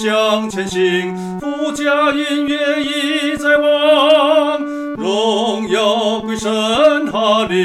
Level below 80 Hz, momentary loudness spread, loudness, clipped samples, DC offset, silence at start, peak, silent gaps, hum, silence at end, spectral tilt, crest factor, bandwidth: -50 dBFS; 9 LU; -15 LUFS; under 0.1%; under 0.1%; 0 s; 0 dBFS; none; none; 0 s; -4 dB/octave; 14 dB; 13.5 kHz